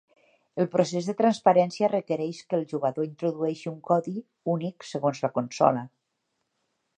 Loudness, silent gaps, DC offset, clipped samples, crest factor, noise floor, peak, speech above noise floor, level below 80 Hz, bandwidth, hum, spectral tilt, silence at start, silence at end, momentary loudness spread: -27 LUFS; none; under 0.1%; under 0.1%; 22 dB; -78 dBFS; -4 dBFS; 53 dB; -76 dBFS; 9.6 kHz; none; -6.5 dB/octave; 0.55 s; 1.1 s; 11 LU